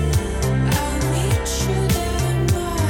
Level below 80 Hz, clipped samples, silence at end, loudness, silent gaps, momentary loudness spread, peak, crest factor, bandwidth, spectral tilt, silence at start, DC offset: -26 dBFS; under 0.1%; 0 s; -20 LUFS; none; 2 LU; -6 dBFS; 12 dB; 18 kHz; -5 dB/octave; 0 s; under 0.1%